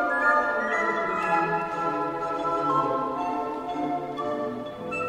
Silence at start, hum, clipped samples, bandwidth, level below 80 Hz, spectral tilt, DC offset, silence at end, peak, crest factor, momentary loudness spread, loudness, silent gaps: 0 s; none; under 0.1%; 14.5 kHz; -60 dBFS; -6 dB/octave; under 0.1%; 0 s; -8 dBFS; 18 dB; 8 LU; -26 LUFS; none